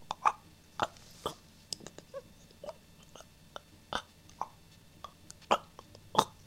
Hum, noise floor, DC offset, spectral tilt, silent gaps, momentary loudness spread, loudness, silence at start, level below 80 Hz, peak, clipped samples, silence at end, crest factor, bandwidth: none; -58 dBFS; under 0.1%; -3 dB/octave; none; 22 LU; -37 LUFS; 0 s; -64 dBFS; -6 dBFS; under 0.1%; 0.15 s; 32 dB; 16.5 kHz